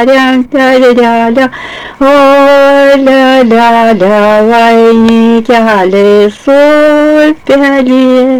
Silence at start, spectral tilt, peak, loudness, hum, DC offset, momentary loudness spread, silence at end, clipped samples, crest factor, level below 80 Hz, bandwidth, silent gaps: 0 s; -5.5 dB/octave; 0 dBFS; -5 LUFS; none; under 0.1%; 4 LU; 0 s; 3%; 4 dB; -40 dBFS; 17.5 kHz; none